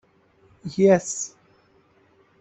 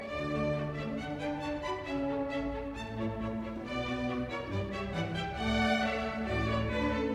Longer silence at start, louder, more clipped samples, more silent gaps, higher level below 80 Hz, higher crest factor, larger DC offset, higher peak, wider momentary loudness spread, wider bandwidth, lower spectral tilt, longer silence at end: first, 0.65 s vs 0 s; first, -22 LUFS vs -34 LUFS; neither; neither; second, -64 dBFS vs -46 dBFS; about the same, 20 dB vs 16 dB; neither; first, -6 dBFS vs -18 dBFS; first, 16 LU vs 7 LU; second, 8.4 kHz vs 12.5 kHz; about the same, -5.5 dB/octave vs -6.5 dB/octave; first, 1.15 s vs 0 s